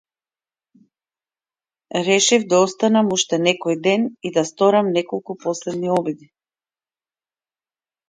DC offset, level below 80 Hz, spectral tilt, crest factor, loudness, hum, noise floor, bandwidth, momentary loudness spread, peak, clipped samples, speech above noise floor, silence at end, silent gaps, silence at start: under 0.1%; -68 dBFS; -3.5 dB/octave; 20 dB; -19 LUFS; none; under -90 dBFS; 9.6 kHz; 11 LU; -2 dBFS; under 0.1%; over 71 dB; 1.9 s; none; 1.95 s